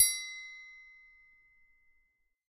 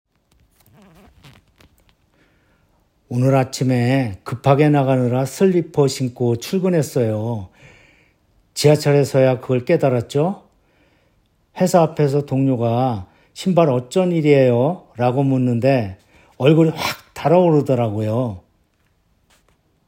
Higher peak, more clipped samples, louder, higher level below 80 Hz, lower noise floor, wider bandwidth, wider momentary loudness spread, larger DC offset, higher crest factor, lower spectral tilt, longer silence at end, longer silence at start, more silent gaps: second, -10 dBFS vs 0 dBFS; neither; second, -33 LUFS vs -18 LUFS; second, -76 dBFS vs -60 dBFS; first, -75 dBFS vs -62 dBFS; about the same, 15.5 kHz vs 16.5 kHz; first, 24 LU vs 10 LU; neither; first, 28 dB vs 18 dB; second, 7.5 dB/octave vs -7 dB/octave; first, 1.7 s vs 1.5 s; second, 0 s vs 3.1 s; neither